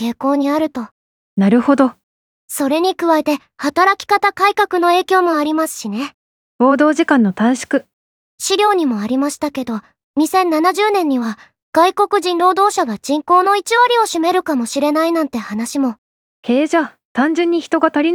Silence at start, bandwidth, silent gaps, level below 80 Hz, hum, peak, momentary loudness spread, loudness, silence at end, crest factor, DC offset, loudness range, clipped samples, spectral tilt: 0 s; 19 kHz; 0.91-1.37 s, 2.03-2.48 s, 6.14-6.59 s, 7.93-8.38 s, 10.03-10.14 s, 11.62-11.73 s, 15.98-16.43 s, 17.05-17.15 s; -62 dBFS; none; 0 dBFS; 10 LU; -15 LUFS; 0 s; 16 dB; under 0.1%; 3 LU; under 0.1%; -4 dB/octave